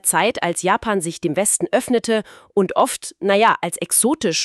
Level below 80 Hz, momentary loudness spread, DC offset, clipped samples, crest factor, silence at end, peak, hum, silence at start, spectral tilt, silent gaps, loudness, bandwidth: -54 dBFS; 6 LU; under 0.1%; under 0.1%; 16 dB; 0 s; -2 dBFS; none; 0.05 s; -3 dB/octave; none; -18 LUFS; 14 kHz